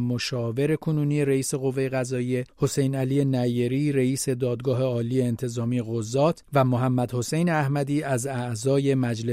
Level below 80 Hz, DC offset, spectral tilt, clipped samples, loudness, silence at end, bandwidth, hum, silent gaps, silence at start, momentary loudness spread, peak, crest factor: -58 dBFS; under 0.1%; -6.5 dB/octave; under 0.1%; -25 LUFS; 0 s; 16 kHz; none; none; 0 s; 4 LU; -8 dBFS; 16 dB